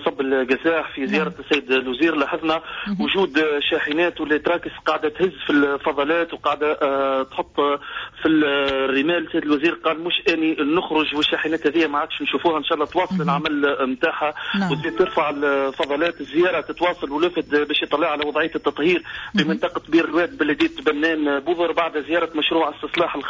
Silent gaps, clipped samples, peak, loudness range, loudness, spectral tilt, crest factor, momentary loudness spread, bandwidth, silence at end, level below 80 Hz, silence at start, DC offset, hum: none; under 0.1%; -6 dBFS; 1 LU; -21 LUFS; -6 dB/octave; 14 dB; 4 LU; 7.6 kHz; 0 s; -54 dBFS; 0 s; under 0.1%; none